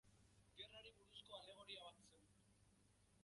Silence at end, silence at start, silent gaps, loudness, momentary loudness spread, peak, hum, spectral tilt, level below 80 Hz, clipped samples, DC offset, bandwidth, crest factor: 0 s; 0.05 s; none; -60 LUFS; 6 LU; -42 dBFS; 50 Hz at -80 dBFS; -2.5 dB/octave; -82 dBFS; under 0.1%; under 0.1%; 11.5 kHz; 22 dB